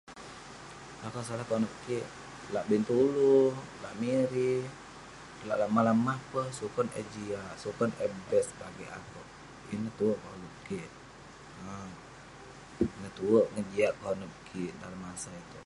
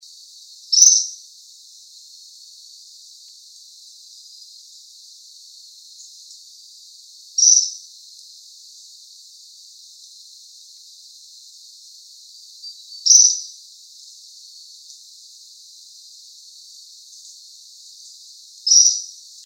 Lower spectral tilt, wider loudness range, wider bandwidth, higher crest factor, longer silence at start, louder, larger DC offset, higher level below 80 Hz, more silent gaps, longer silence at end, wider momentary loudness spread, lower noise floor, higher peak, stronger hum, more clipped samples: first, -6 dB/octave vs 9.5 dB/octave; second, 9 LU vs 22 LU; second, 11.5 kHz vs 16 kHz; about the same, 20 dB vs 24 dB; second, 0.05 s vs 0.7 s; second, -32 LUFS vs -13 LUFS; neither; first, -62 dBFS vs under -90 dBFS; neither; second, 0 s vs 0.4 s; second, 21 LU vs 30 LU; first, -51 dBFS vs -45 dBFS; second, -12 dBFS vs 0 dBFS; neither; neither